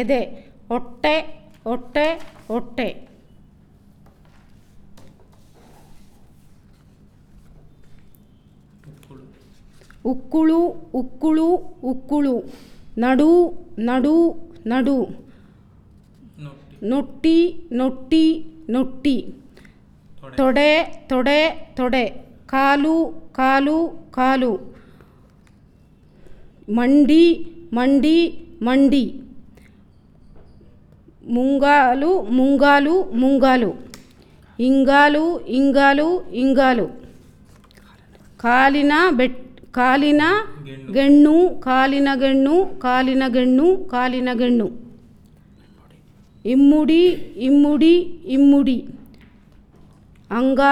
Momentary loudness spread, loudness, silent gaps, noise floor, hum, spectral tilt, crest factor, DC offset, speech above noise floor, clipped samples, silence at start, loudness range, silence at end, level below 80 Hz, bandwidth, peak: 13 LU; -18 LUFS; none; -51 dBFS; none; -5.5 dB/octave; 16 dB; under 0.1%; 34 dB; under 0.1%; 0 s; 8 LU; 0 s; -46 dBFS; 11 kHz; -2 dBFS